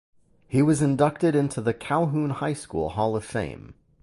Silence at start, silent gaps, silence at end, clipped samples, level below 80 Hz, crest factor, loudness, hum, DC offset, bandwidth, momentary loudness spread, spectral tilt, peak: 0.5 s; none; 0.3 s; under 0.1%; -52 dBFS; 18 dB; -25 LUFS; none; under 0.1%; 11.5 kHz; 9 LU; -7 dB/octave; -8 dBFS